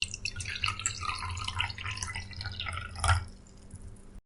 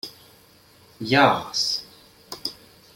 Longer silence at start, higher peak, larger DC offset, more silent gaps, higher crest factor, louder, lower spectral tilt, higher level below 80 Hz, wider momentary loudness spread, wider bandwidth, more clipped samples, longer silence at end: about the same, 0 s vs 0.05 s; second, -12 dBFS vs -2 dBFS; neither; neither; about the same, 24 dB vs 24 dB; second, -33 LUFS vs -22 LUFS; second, -2 dB/octave vs -3.5 dB/octave; first, -46 dBFS vs -62 dBFS; about the same, 20 LU vs 19 LU; second, 11.5 kHz vs 16.5 kHz; neither; second, 0.05 s vs 0.4 s